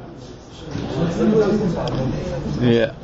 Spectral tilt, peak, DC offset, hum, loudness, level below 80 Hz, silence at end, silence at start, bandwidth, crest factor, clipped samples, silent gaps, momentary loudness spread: -7.5 dB/octave; -6 dBFS; under 0.1%; none; -20 LUFS; -38 dBFS; 0 s; 0 s; 8 kHz; 16 dB; under 0.1%; none; 20 LU